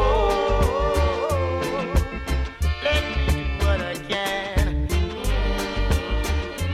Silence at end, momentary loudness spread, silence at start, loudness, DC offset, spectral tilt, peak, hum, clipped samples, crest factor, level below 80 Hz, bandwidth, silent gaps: 0 s; 5 LU; 0 s; -24 LUFS; under 0.1%; -5.5 dB/octave; -8 dBFS; none; under 0.1%; 14 dB; -26 dBFS; 15.5 kHz; none